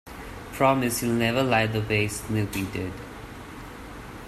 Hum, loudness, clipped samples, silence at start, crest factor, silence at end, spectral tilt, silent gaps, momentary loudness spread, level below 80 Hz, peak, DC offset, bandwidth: none; -25 LUFS; under 0.1%; 0.05 s; 20 dB; 0 s; -5 dB/octave; none; 18 LU; -46 dBFS; -6 dBFS; under 0.1%; 15 kHz